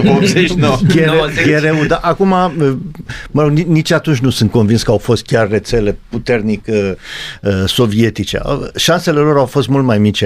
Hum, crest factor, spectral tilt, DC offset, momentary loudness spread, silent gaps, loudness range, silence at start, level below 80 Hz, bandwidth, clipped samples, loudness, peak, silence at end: none; 12 dB; -6 dB/octave; under 0.1%; 8 LU; none; 3 LU; 0 s; -34 dBFS; 15.5 kHz; under 0.1%; -13 LUFS; 0 dBFS; 0 s